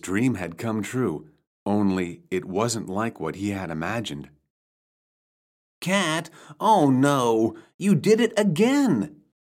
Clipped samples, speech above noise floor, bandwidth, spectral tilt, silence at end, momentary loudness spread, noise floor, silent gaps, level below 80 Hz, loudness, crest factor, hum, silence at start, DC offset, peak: under 0.1%; over 67 dB; 16 kHz; -5.5 dB/octave; 0.3 s; 11 LU; under -90 dBFS; 1.47-1.66 s, 4.50-5.81 s, 7.74-7.79 s; -62 dBFS; -24 LUFS; 18 dB; none; 0.05 s; under 0.1%; -8 dBFS